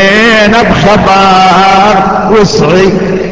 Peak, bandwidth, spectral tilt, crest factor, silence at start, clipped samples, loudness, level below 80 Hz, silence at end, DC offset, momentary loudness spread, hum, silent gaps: 0 dBFS; 8 kHz; -5 dB/octave; 4 dB; 0 s; 4%; -5 LUFS; -28 dBFS; 0 s; under 0.1%; 3 LU; none; none